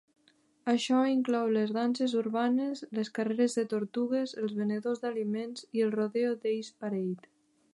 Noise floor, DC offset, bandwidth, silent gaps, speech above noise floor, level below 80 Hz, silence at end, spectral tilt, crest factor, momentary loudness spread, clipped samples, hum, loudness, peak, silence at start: -68 dBFS; under 0.1%; 11.5 kHz; none; 38 dB; -84 dBFS; 0.55 s; -5.5 dB/octave; 16 dB; 8 LU; under 0.1%; none; -31 LUFS; -14 dBFS; 0.65 s